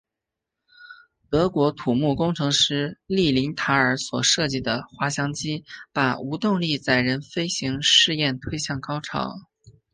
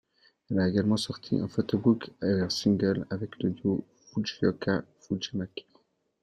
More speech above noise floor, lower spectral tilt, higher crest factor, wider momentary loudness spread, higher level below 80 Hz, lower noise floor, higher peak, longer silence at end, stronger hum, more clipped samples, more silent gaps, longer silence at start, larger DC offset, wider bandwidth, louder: first, 62 dB vs 39 dB; second, -3.5 dB/octave vs -6.5 dB/octave; about the same, 20 dB vs 18 dB; about the same, 10 LU vs 10 LU; first, -52 dBFS vs -62 dBFS; first, -85 dBFS vs -67 dBFS; first, -4 dBFS vs -10 dBFS; second, 0.25 s vs 0.6 s; neither; neither; neither; first, 0.8 s vs 0.5 s; neither; second, 10 kHz vs 12 kHz; first, -22 LUFS vs -29 LUFS